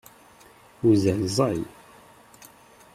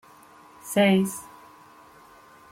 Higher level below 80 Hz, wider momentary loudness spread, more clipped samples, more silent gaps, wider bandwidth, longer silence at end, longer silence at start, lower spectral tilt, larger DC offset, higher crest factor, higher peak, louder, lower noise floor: first, -58 dBFS vs -68 dBFS; second, 11 LU vs 24 LU; neither; neither; about the same, 15 kHz vs 16.5 kHz; about the same, 1.25 s vs 1.3 s; first, 0.85 s vs 0.65 s; first, -6.5 dB/octave vs -5 dB/octave; neither; about the same, 18 dB vs 18 dB; about the same, -8 dBFS vs -8 dBFS; about the same, -23 LUFS vs -23 LUFS; about the same, -52 dBFS vs -51 dBFS